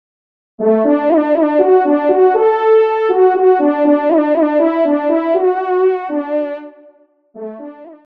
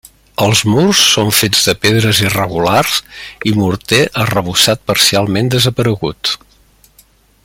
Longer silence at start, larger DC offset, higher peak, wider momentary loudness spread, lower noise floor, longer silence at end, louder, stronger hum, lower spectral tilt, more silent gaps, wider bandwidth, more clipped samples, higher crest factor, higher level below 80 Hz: first, 0.6 s vs 0.4 s; first, 0.1% vs under 0.1%; about the same, -2 dBFS vs 0 dBFS; first, 14 LU vs 9 LU; about the same, -48 dBFS vs -49 dBFS; second, 0.1 s vs 1.1 s; about the same, -13 LUFS vs -12 LUFS; neither; first, -8.5 dB/octave vs -3.5 dB/octave; neither; second, 4.7 kHz vs 17 kHz; neither; about the same, 12 dB vs 14 dB; second, -68 dBFS vs -44 dBFS